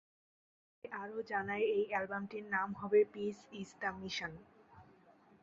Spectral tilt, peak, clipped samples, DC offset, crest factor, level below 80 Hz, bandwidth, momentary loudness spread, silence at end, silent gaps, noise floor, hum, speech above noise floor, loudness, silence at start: -3 dB/octave; -20 dBFS; under 0.1%; under 0.1%; 20 dB; -74 dBFS; 7.6 kHz; 16 LU; 0.6 s; none; -65 dBFS; none; 28 dB; -37 LUFS; 0.85 s